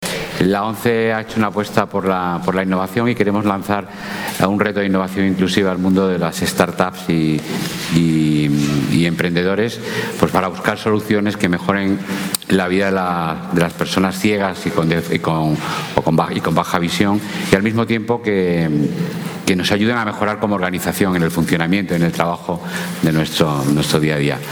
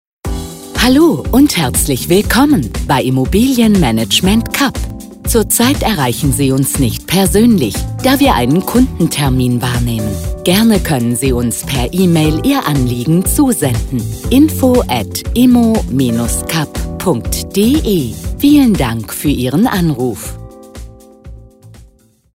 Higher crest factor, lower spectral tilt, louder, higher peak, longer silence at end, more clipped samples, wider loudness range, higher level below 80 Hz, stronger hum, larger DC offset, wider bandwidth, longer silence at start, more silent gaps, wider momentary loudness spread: first, 18 dB vs 12 dB; about the same, -5.5 dB/octave vs -5 dB/octave; second, -17 LUFS vs -12 LUFS; about the same, 0 dBFS vs 0 dBFS; second, 0 s vs 0.5 s; neither; about the same, 1 LU vs 2 LU; second, -46 dBFS vs -26 dBFS; neither; neither; first, over 20 kHz vs 16.5 kHz; second, 0 s vs 0.25 s; neither; second, 5 LU vs 8 LU